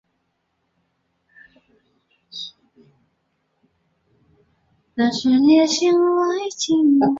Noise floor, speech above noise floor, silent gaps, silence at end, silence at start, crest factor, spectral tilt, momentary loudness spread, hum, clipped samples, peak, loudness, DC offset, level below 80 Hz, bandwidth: -71 dBFS; 55 dB; none; 0 s; 2.35 s; 16 dB; -4 dB/octave; 19 LU; none; under 0.1%; -4 dBFS; -17 LUFS; under 0.1%; -64 dBFS; 7.8 kHz